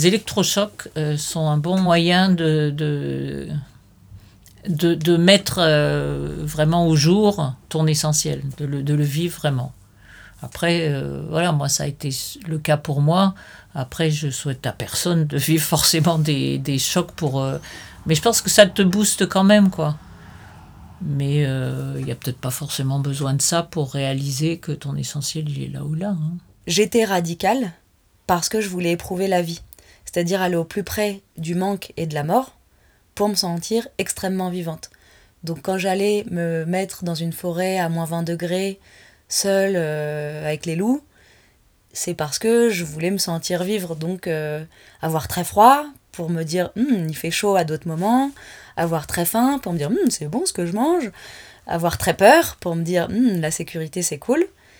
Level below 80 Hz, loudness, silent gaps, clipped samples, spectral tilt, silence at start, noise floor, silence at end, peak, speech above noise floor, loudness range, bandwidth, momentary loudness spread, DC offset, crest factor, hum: -50 dBFS; -20 LUFS; none; under 0.1%; -4.5 dB/octave; 0 s; -57 dBFS; 0.3 s; 0 dBFS; 37 dB; 6 LU; over 20 kHz; 12 LU; under 0.1%; 20 dB; none